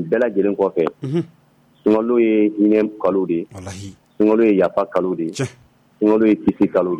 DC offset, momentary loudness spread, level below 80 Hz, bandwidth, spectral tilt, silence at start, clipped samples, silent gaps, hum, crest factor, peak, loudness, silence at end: under 0.1%; 13 LU; -56 dBFS; 10.5 kHz; -7.5 dB/octave; 0 s; under 0.1%; none; none; 12 dB; -6 dBFS; -18 LUFS; 0 s